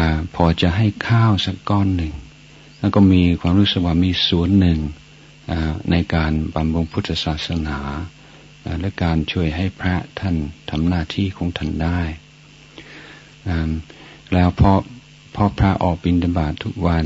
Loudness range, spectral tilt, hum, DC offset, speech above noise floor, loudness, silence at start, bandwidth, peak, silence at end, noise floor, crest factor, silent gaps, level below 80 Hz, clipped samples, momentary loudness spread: 7 LU; -7.5 dB/octave; none; under 0.1%; 27 dB; -19 LUFS; 0 s; 7.8 kHz; 0 dBFS; 0 s; -45 dBFS; 18 dB; none; -32 dBFS; under 0.1%; 14 LU